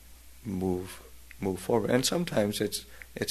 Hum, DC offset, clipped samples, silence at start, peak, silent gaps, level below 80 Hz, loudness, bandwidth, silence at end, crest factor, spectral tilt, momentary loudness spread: none; 0.2%; under 0.1%; 0 s; -10 dBFS; none; -54 dBFS; -30 LUFS; 13.5 kHz; 0 s; 20 dB; -4.5 dB/octave; 17 LU